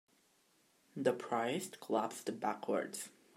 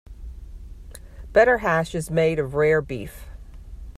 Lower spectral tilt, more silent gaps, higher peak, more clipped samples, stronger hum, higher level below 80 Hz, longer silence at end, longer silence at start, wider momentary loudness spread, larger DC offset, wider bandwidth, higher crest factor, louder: second, -4 dB/octave vs -6 dB/octave; neither; second, -18 dBFS vs -4 dBFS; neither; neither; second, -90 dBFS vs -40 dBFS; first, 0.25 s vs 0.05 s; first, 0.95 s vs 0.1 s; second, 7 LU vs 25 LU; neither; first, 16 kHz vs 14.5 kHz; about the same, 22 dB vs 20 dB; second, -38 LUFS vs -21 LUFS